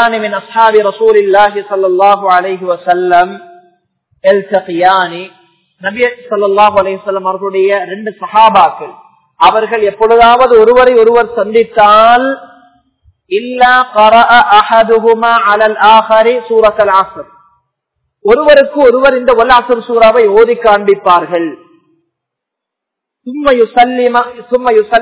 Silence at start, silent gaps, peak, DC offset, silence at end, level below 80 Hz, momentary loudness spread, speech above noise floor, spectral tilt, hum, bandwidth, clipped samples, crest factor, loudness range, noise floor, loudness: 0 s; none; 0 dBFS; under 0.1%; 0 s; -44 dBFS; 10 LU; 70 dB; -7.5 dB/octave; none; 4 kHz; 5%; 8 dB; 6 LU; -78 dBFS; -8 LUFS